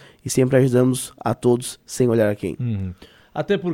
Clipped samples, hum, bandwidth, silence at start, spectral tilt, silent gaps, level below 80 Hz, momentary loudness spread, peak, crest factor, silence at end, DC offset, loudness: under 0.1%; none; 16.5 kHz; 0.25 s; -6 dB/octave; none; -52 dBFS; 13 LU; -2 dBFS; 18 dB; 0 s; under 0.1%; -21 LUFS